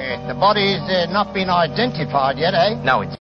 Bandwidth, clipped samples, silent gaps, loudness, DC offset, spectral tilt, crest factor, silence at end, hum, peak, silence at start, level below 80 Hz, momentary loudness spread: 6.6 kHz; under 0.1%; none; -18 LUFS; under 0.1%; -6.5 dB/octave; 16 dB; 0.05 s; none; -2 dBFS; 0 s; -46 dBFS; 4 LU